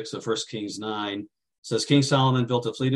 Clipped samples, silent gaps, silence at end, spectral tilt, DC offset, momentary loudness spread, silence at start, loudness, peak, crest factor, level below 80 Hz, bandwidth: under 0.1%; 1.58-1.62 s; 0 s; -5.5 dB/octave; under 0.1%; 13 LU; 0 s; -25 LUFS; -6 dBFS; 18 dB; -66 dBFS; 11.5 kHz